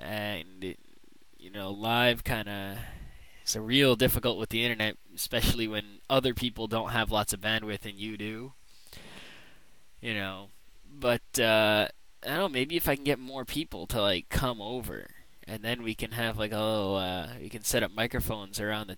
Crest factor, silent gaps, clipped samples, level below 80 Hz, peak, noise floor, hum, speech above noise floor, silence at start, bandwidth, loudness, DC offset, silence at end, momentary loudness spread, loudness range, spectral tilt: 22 dB; none; under 0.1%; -46 dBFS; -10 dBFS; -61 dBFS; none; 31 dB; 0 s; 19.5 kHz; -30 LUFS; 0.3%; 0 s; 16 LU; 6 LU; -4 dB/octave